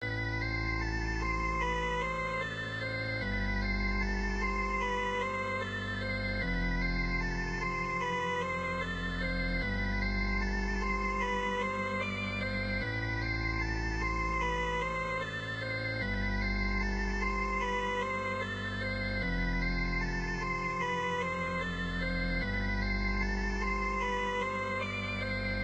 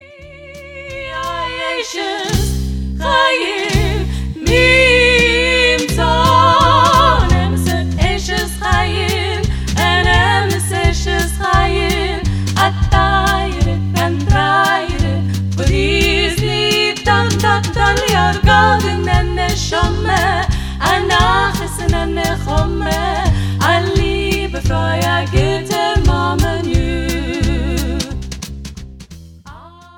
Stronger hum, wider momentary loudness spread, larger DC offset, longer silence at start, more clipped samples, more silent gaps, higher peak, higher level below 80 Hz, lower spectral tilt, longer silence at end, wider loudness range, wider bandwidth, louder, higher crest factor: neither; second, 2 LU vs 10 LU; neither; about the same, 0 s vs 0.05 s; neither; neither; second, -20 dBFS vs 0 dBFS; second, -38 dBFS vs -22 dBFS; about the same, -5.5 dB/octave vs -4.5 dB/octave; second, 0 s vs 0.3 s; second, 0 LU vs 6 LU; second, 8.4 kHz vs 19 kHz; second, -33 LUFS vs -14 LUFS; about the same, 14 dB vs 14 dB